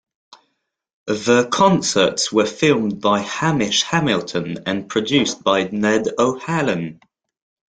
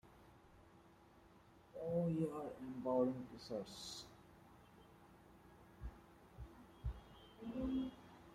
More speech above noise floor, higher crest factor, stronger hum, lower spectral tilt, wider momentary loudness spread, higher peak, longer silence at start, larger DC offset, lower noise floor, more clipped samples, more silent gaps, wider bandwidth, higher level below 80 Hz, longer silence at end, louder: first, 54 dB vs 24 dB; about the same, 18 dB vs 20 dB; neither; second, -4 dB/octave vs -7 dB/octave; second, 9 LU vs 26 LU; first, -2 dBFS vs -26 dBFS; first, 1.05 s vs 0.05 s; neither; first, -72 dBFS vs -66 dBFS; neither; neither; second, 9.6 kHz vs 15.5 kHz; about the same, -56 dBFS vs -60 dBFS; first, 0.75 s vs 0 s; first, -18 LUFS vs -45 LUFS